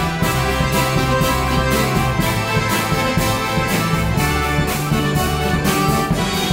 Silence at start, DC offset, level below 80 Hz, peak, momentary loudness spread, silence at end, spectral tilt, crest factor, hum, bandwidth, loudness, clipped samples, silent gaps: 0 s; under 0.1%; -28 dBFS; -4 dBFS; 2 LU; 0 s; -4.5 dB/octave; 14 dB; none; 16.5 kHz; -17 LUFS; under 0.1%; none